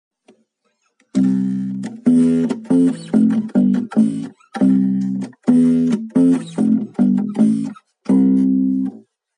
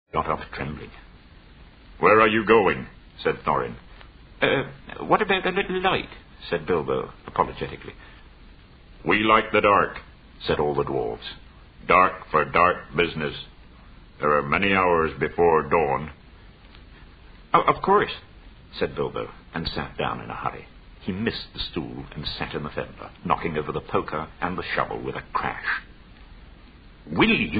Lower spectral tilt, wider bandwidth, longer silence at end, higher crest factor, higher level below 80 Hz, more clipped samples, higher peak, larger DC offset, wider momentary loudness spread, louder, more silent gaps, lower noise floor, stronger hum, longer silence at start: about the same, -8.5 dB/octave vs -9 dB/octave; first, 10 kHz vs 5 kHz; first, 0.4 s vs 0 s; second, 14 dB vs 22 dB; second, -70 dBFS vs -46 dBFS; neither; about the same, -2 dBFS vs -4 dBFS; neither; second, 9 LU vs 17 LU; first, -17 LUFS vs -24 LUFS; neither; first, -67 dBFS vs -48 dBFS; neither; first, 1.15 s vs 0.15 s